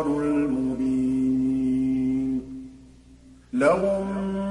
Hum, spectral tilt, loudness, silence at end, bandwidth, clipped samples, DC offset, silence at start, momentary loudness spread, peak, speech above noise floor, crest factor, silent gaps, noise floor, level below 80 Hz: 60 Hz at -50 dBFS; -8 dB/octave; -24 LUFS; 0 s; 10.5 kHz; under 0.1%; under 0.1%; 0 s; 10 LU; -8 dBFS; 28 dB; 16 dB; none; -50 dBFS; -48 dBFS